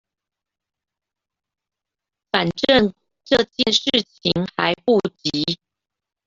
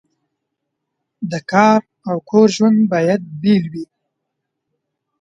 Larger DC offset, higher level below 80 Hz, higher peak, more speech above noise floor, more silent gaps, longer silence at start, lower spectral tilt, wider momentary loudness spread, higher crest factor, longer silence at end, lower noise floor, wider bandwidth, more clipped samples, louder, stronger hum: neither; first, -54 dBFS vs -62 dBFS; about the same, 0 dBFS vs 0 dBFS; first, 66 dB vs 62 dB; neither; first, 2.35 s vs 1.2 s; second, -4.5 dB/octave vs -6.5 dB/octave; second, 7 LU vs 16 LU; about the same, 22 dB vs 18 dB; second, 0.7 s vs 1.35 s; first, -86 dBFS vs -77 dBFS; about the same, 7.8 kHz vs 7.8 kHz; neither; second, -19 LUFS vs -15 LUFS; neither